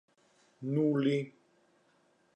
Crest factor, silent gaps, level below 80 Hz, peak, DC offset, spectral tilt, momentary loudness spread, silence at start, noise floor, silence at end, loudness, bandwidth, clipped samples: 16 dB; none; -86 dBFS; -18 dBFS; under 0.1%; -8.5 dB/octave; 15 LU; 0.6 s; -70 dBFS; 1.05 s; -32 LUFS; 8.6 kHz; under 0.1%